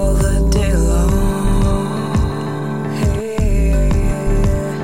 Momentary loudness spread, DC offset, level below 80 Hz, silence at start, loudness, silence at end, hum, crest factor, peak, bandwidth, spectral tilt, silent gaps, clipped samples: 5 LU; 1%; -16 dBFS; 0 s; -17 LUFS; 0 s; none; 10 dB; -4 dBFS; 16 kHz; -6.5 dB/octave; none; under 0.1%